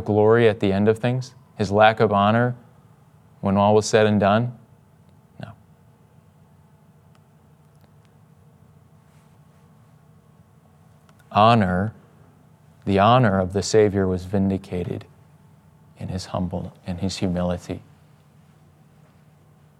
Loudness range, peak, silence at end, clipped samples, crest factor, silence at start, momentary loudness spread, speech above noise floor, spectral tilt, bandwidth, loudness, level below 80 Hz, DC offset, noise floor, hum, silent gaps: 10 LU; 0 dBFS; 2 s; under 0.1%; 22 dB; 0 s; 18 LU; 34 dB; -6.5 dB/octave; 12 kHz; -20 LUFS; -62 dBFS; under 0.1%; -54 dBFS; none; none